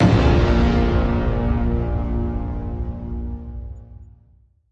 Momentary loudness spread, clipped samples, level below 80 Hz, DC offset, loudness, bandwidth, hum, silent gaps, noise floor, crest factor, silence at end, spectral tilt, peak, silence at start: 17 LU; under 0.1%; -24 dBFS; under 0.1%; -21 LUFS; 7.6 kHz; none; none; -55 dBFS; 16 dB; 0.65 s; -8 dB/octave; -4 dBFS; 0 s